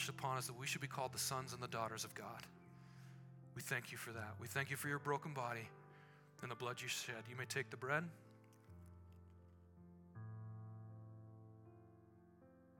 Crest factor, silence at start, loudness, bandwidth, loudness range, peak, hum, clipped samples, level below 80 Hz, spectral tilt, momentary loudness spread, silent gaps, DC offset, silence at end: 24 dB; 0 s; -46 LUFS; 18 kHz; 13 LU; -24 dBFS; none; under 0.1%; -84 dBFS; -3.5 dB/octave; 22 LU; none; under 0.1%; 0 s